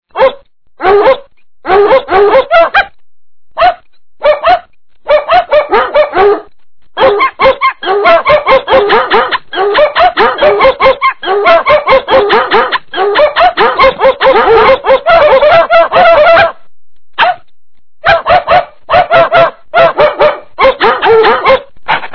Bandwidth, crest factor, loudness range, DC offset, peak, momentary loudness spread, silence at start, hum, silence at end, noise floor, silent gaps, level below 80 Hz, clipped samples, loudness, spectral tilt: 5.4 kHz; 8 dB; 4 LU; under 0.1%; 0 dBFS; 6 LU; 0.15 s; none; 0 s; -34 dBFS; none; -36 dBFS; 4%; -7 LUFS; -5.5 dB/octave